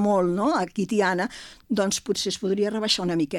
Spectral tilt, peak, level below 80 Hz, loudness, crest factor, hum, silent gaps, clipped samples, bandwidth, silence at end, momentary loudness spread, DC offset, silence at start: -4 dB/octave; -8 dBFS; -58 dBFS; -24 LUFS; 16 dB; none; none; under 0.1%; 17 kHz; 0 s; 6 LU; under 0.1%; 0 s